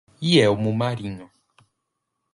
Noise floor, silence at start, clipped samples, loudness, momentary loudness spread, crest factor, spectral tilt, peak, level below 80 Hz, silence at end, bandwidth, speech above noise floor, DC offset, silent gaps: -79 dBFS; 0.2 s; under 0.1%; -21 LUFS; 17 LU; 20 dB; -6 dB/octave; -4 dBFS; -56 dBFS; 1.1 s; 11.5 kHz; 58 dB; under 0.1%; none